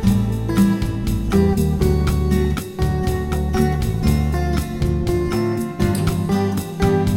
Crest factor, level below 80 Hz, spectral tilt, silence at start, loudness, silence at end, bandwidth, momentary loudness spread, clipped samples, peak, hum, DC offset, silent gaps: 14 dB; -26 dBFS; -7 dB/octave; 0 s; -20 LUFS; 0 s; 17 kHz; 5 LU; under 0.1%; -4 dBFS; none; under 0.1%; none